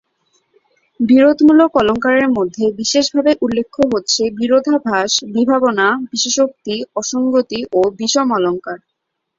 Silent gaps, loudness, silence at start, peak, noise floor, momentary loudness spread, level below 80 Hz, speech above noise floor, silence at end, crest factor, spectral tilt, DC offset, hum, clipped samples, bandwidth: none; -15 LUFS; 1 s; -2 dBFS; -63 dBFS; 9 LU; -52 dBFS; 48 dB; 0.6 s; 14 dB; -3 dB/octave; under 0.1%; none; under 0.1%; 7.8 kHz